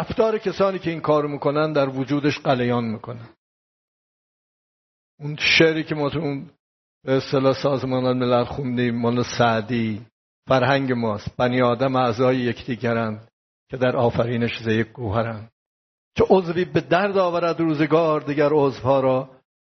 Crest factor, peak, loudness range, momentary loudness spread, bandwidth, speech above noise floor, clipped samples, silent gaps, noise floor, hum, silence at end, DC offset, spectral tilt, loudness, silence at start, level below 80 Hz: 18 dB; -2 dBFS; 4 LU; 10 LU; 6.4 kHz; over 69 dB; under 0.1%; 3.38-5.18 s, 6.60-7.01 s, 10.12-10.43 s, 13.33-13.67 s, 15.52-16.11 s; under -90 dBFS; none; 0.4 s; under 0.1%; -4.5 dB/octave; -21 LUFS; 0 s; -54 dBFS